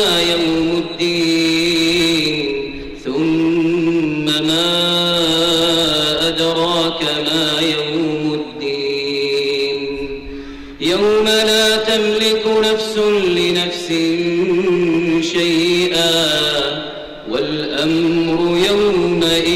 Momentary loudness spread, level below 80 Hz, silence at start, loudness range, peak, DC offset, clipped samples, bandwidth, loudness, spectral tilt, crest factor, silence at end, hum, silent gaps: 8 LU; -44 dBFS; 0 s; 3 LU; -6 dBFS; under 0.1%; under 0.1%; 16 kHz; -15 LUFS; -4 dB/octave; 10 dB; 0 s; none; none